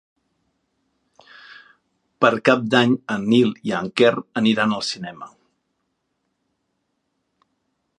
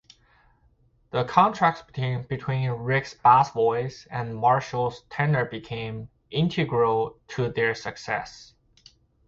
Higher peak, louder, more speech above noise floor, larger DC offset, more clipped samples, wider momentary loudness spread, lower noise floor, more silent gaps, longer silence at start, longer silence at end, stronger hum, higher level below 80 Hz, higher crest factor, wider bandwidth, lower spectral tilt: about the same, 0 dBFS vs -2 dBFS; first, -19 LUFS vs -25 LUFS; first, 55 dB vs 38 dB; neither; neither; second, 10 LU vs 13 LU; first, -74 dBFS vs -62 dBFS; neither; first, 1.5 s vs 1.15 s; first, 2.7 s vs 0.85 s; neither; second, -68 dBFS vs -56 dBFS; about the same, 22 dB vs 24 dB; first, 10.5 kHz vs 7.6 kHz; about the same, -5.5 dB/octave vs -6.5 dB/octave